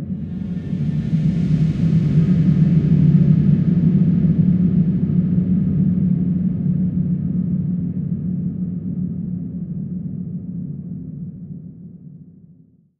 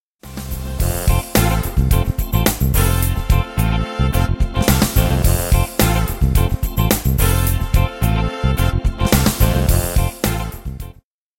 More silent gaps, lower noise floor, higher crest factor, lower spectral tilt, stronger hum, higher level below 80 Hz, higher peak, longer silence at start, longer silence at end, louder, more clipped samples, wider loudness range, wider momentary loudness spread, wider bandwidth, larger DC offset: neither; first, -50 dBFS vs -44 dBFS; about the same, 14 dB vs 16 dB; first, -11.5 dB/octave vs -5 dB/octave; neither; second, -40 dBFS vs -20 dBFS; second, -4 dBFS vs 0 dBFS; second, 0 s vs 0.25 s; first, 0.7 s vs 0.5 s; about the same, -18 LUFS vs -18 LUFS; neither; first, 13 LU vs 1 LU; first, 15 LU vs 7 LU; second, 4.3 kHz vs 17 kHz; second, under 0.1% vs 0.2%